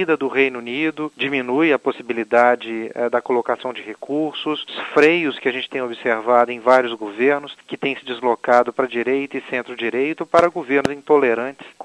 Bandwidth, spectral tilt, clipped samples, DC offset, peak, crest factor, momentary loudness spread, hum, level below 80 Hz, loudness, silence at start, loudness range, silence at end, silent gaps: 11 kHz; -5.5 dB/octave; under 0.1%; under 0.1%; 0 dBFS; 20 dB; 10 LU; none; -64 dBFS; -19 LUFS; 0 s; 2 LU; 0.15 s; none